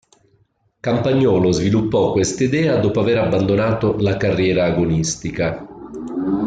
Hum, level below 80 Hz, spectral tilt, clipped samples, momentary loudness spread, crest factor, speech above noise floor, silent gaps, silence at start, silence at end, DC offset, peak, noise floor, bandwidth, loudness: none; -44 dBFS; -6 dB/octave; under 0.1%; 8 LU; 12 dB; 44 dB; none; 0.85 s; 0 s; under 0.1%; -6 dBFS; -61 dBFS; 9.4 kHz; -18 LUFS